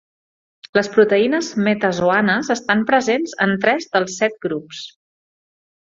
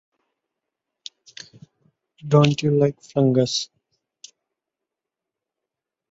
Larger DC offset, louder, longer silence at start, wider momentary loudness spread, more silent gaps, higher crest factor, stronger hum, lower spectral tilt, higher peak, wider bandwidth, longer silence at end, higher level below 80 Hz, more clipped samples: neither; about the same, -18 LUFS vs -20 LUFS; second, 0.65 s vs 2.25 s; second, 11 LU vs 24 LU; first, 0.69-0.73 s vs none; about the same, 18 dB vs 22 dB; neither; second, -4.5 dB/octave vs -6 dB/octave; first, 0 dBFS vs -4 dBFS; about the same, 7.8 kHz vs 8 kHz; second, 1.05 s vs 2.45 s; about the same, -60 dBFS vs -62 dBFS; neither